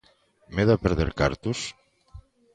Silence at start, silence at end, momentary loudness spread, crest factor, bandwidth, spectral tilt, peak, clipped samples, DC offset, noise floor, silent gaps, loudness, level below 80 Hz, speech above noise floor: 0.5 s; 0.35 s; 11 LU; 20 dB; 9.6 kHz; -6 dB/octave; -6 dBFS; under 0.1%; under 0.1%; -60 dBFS; none; -25 LUFS; -38 dBFS; 36 dB